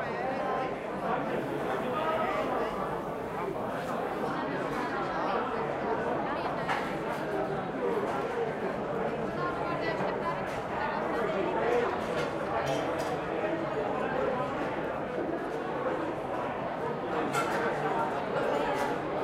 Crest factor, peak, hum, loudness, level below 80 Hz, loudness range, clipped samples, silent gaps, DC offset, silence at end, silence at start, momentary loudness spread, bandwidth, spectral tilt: 16 dB; -16 dBFS; none; -32 LUFS; -58 dBFS; 2 LU; under 0.1%; none; under 0.1%; 0 s; 0 s; 4 LU; 16 kHz; -6 dB/octave